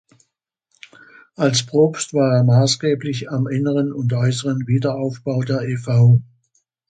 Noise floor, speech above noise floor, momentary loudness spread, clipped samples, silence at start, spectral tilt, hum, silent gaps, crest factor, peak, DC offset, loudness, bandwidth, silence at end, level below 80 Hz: -74 dBFS; 56 dB; 8 LU; under 0.1%; 1.4 s; -6 dB/octave; none; none; 16 dB; -4 dBFS; under 0.1%; -18 LUFS; 9.2 kHz; 0.65 s; -56 dBFS